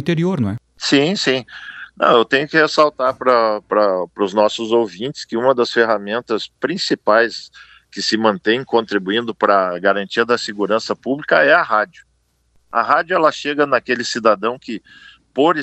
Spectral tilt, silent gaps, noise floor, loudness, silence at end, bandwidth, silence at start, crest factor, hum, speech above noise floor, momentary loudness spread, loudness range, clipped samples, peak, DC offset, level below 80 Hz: -4.5 dB/octave; none; -60 dBFS; -17 LUFS; 0 s; 8.6 kHz; 0 s; 18 dB; none; 43 dB; 9 LU; 3 LU; under 0.1%; 0 dBFS; under 0.1%; -62 dBFS